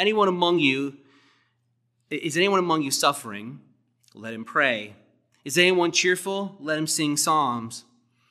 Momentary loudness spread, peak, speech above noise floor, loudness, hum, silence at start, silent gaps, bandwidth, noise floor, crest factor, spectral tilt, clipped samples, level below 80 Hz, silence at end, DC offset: 17 LU; -4 dBFS; 48 dB; -23 LUFS; none; 0 s; none; 15 kHz; -71 dBFS; 20 dB; -3 dB/octave; under 0.1%; -82 dBFS; 0.5 s; under 0.1%